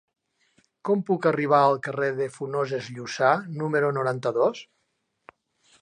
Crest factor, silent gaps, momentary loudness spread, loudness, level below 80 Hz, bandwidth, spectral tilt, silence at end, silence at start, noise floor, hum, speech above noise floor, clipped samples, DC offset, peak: 20 dB; none; 10 LU; -24 LUFS; -76 dBFS; 10 kHz; -6 dB/octave; 1.2 s; 0.85 s; -75 dBFS; none; 51 dB; under 0.1%; under 0.1%; -6 dBFS